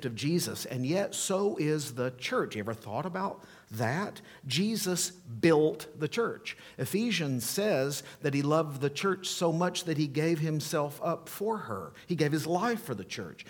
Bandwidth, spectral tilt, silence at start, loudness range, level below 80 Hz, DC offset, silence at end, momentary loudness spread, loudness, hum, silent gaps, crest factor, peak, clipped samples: 19 kHz; -4.5 dB/octave; 0 s; 3 LU; -72 dBFS; under 0.1%; 0 s; 8 LU; -31 LUFS; none; none; 20 dB; -10 dBFS; under 0.1%